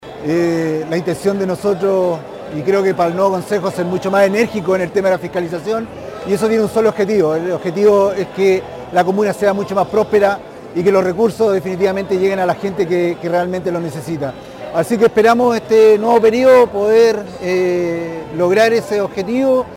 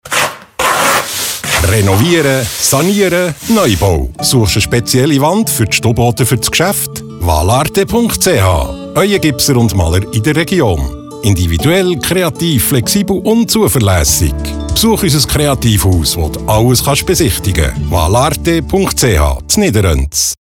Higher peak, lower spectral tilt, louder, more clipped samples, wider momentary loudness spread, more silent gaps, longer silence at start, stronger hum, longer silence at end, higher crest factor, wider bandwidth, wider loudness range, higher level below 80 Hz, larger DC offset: about the same, -2 dBFS vs 0 dBFS; first, -6 dB/octave vs -4.5 dB/octave; second, -15 LUFS vs -11 LUFS; neither; first, 10 LU vs 4 LU; neither; about the same, 0 s vs 0.05 s; neither; about the same, 0 s vs 0.05 s; about the same, 14 dB vs 12 dB; second, 16.5 kHz vs 19 kHz; first, 5 LU vs 1 LU; second, -50 dBFS vs -22 dBFS; neither